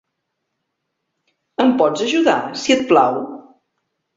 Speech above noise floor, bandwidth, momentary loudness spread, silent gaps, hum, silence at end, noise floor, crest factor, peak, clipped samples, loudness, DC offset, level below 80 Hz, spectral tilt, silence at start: 60 dB; 7.8 kHz; 12 LU; none; none; 0.75 s; -75 dBFS; 18 dB; -2 dBFS; under 0.1%; -16 LUFS; under 0.1%; -62 dBFS; -4 dB/octave; 1.6 s